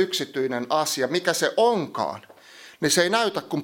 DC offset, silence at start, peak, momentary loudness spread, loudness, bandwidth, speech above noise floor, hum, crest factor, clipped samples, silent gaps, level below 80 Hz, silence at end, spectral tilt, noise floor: under 0.1%; 0 s; -6 dBFS; 9 LU; -23 LUFS; 17 kHz; 24 dB; none; 18 dB; under 0.1%; none; -72 dBFS; 0 s; -3 dB/octave; -48 dBFS